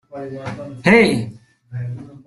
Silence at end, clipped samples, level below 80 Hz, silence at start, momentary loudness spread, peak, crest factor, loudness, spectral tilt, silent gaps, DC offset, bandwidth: 0.1 s; under 0.1%; -52 dBFS; 0.1 s; 19 LU; -2 dBFS; 18 dB; -15 LUFS; -6 dB/octave; none; under 0.1%; 12 kHz